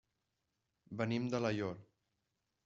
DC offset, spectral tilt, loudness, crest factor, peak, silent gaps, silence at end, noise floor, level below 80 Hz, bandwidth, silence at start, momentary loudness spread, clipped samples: under 0.1%; -6 dB/octave; -38 LUFS; 20 dB; -22 dBFS; none; 0.8 s; -86 dBFS; -76 dBFS; 7.8 kHz; 0.9 s; 13 LU; under 0.1%